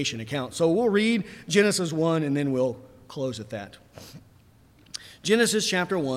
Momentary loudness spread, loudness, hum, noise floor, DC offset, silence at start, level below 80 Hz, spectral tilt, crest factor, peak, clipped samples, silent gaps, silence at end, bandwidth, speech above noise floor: 19 LU; -25 LUFS; none; -56 dBFS; under 0.1%; 0 s; -64 dBFS; -4.5 dB/octave; 18 dB; -8 dBFS; under 0.1%; none; 0 s; 16 kHz; 31 dB